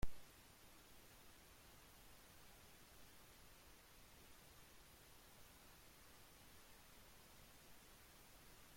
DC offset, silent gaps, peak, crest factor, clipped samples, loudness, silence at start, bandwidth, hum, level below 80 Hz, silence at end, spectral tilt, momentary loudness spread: under 0.1%; none; -30 dBFS; 26 dB; under 0.1%; -64 LUFS; 0 s; 16.5 kHz; none; -64 dBFS; 0 s; -3.5 dB/octave; 1 LU